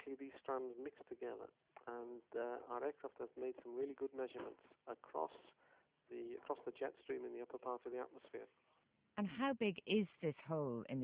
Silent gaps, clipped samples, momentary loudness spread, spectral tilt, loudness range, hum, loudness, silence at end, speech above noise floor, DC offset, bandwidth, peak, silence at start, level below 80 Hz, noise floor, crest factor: none; under 0.1%; 15 LU; -5 dB/octave; 6 LU; none; -46 LUFS; 0 s; 29 dB; under 0.1%; 4 kHz; -26 dBFS; 0 s; -84 dBFS; -74 dBFS; 20 dB